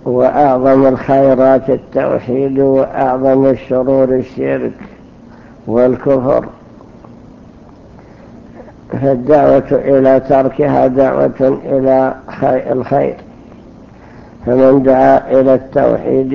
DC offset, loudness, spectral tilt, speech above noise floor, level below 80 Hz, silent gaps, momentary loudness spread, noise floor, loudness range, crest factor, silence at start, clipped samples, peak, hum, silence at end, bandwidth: under 0.1%; -12 LUFS; -10 dB/octave; 27 dB; -42 dBFS; none; 8 LU; -37 dBFS; 6 LU; 12 dB; 0.05 s; under 0.1%; 0 dBFS; none; 0 s; 6.4 kHz